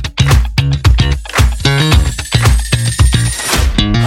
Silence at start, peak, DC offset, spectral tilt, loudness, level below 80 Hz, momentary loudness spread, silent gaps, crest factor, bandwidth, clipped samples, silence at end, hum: 0 s; 0 dBFS; under 0.1%; -4.5 dB/octave; -12 LUFS; -14 dBFS; 3 LU; none; 10 dB; 16.5 kHz; under 0.1%; 0 s; none